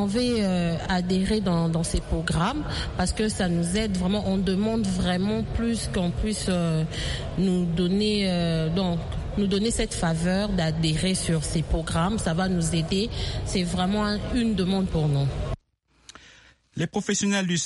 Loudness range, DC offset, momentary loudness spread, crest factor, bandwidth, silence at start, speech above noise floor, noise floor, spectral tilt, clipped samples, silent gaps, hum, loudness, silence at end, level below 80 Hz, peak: 2 LU; under 0.1%; 4 LU; 14 dB; 11.5 kHz; 0 s; 39 dB; -64 dBFS; -5.5 dB/octave; under 0.1%; none; none; -25 LUFS; 0 s; -36 dBFS; -12 dBFS